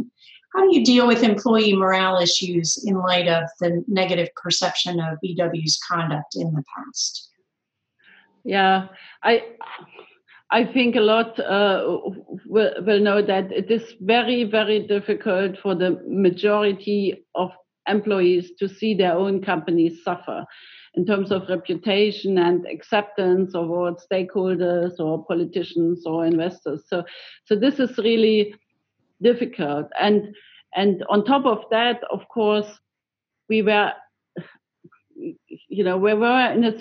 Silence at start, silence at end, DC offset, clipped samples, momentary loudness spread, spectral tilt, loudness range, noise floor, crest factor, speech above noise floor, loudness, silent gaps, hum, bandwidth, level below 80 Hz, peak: 0 s; 0 s; under 0.1%; under 0.1%; 12 LU; -4.5 dB/octave; 5 LU; -85 dBFS; 18 dB; 65 dB; -21 LUFS; none; none; 8.6 kHz; -78 dBFS; -4 dBFS